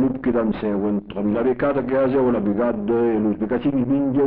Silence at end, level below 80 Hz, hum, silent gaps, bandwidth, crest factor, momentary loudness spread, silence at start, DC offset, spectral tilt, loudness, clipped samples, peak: 0 s; -46 dBFS; none; none; 4.5 kHz; 10 dB; 4 LU; 0 s; under 0.1%; -7.5 dB/octave; -21 LUFS; under 0.1%; -10 dBFS